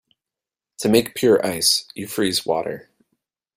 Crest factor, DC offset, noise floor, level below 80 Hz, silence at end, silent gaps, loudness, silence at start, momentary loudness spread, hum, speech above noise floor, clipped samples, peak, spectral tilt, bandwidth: 20 dB; under 0.1%; -89 dBFS; -58 dBFS; 0.75 s; none; -19 LUFS; 0.8 s; 11 LU; none; 69 dB; under 0.1%; -2 dBFS; -3.5 dB/octave; 16 kHz